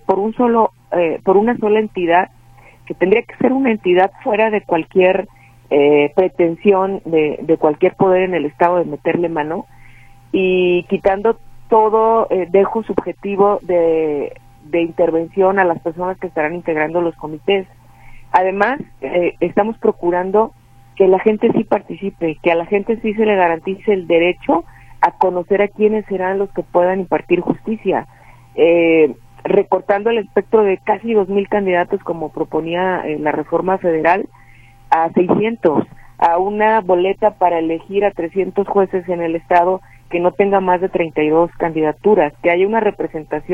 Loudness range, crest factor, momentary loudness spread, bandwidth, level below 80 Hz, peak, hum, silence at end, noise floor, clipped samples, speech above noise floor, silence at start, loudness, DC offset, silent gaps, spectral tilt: 3 LU; 16 dB; 7 LU; 5.2 kHz; -46 dBFS; 0 dBFS; none; 0 s; -44 dBFS; under 0.1%; 29 dB; 0.1 s; -16 LUFS; under 0.1%; none; -8 dB/octave